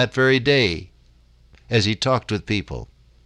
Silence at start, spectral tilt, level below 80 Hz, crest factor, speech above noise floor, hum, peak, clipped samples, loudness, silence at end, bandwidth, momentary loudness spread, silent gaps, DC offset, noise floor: 0 s; -5 dB/octave; -44 dBFS; 18 dB; 33 dB; none; -4 dBFS; under 0.1%; -20 LUFS; 0.4 s; 10.5 kHz; 14 LU; none; under 0.1%; -53 dBFS